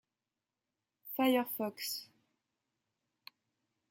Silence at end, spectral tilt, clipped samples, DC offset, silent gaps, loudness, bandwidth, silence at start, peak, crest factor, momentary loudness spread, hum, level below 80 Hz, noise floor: 1.85 s; -3 dB/octave; under 0.1%; under 0.1%; none; -35 LUFS; 17 kHz; 1.05 s; -18 dBFS; 22 dB; 12 LU; none; -88 dBFS; under -90 dBFS